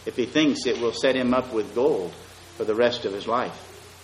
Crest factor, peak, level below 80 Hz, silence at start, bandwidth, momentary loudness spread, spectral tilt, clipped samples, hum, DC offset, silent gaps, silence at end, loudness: 16 dB; -8 dBFS; -58 dBFS; 0 s; 13.5 kHz; 17 LU; -4.5 dB/octave; under 0.1%; none; under 0.1%; none; 0 s; -24 LUFS